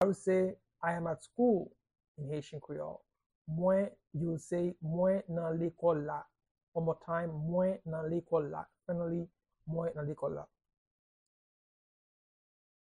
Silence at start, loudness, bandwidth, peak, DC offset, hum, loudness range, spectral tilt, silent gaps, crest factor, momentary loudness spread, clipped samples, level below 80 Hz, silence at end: 0 s; -35 LUFS; 10.5 kHz; -18 dBFS; under 0.1%; none; 7 LU; -8.5 dB/octave; 2.08-2.15 s, 3.26-3.45 s, 6.51-6.55 s, 6.63-6.72 s; 18 dB; 13 LU; under 0.1%; -68 dBFS; 2.4 s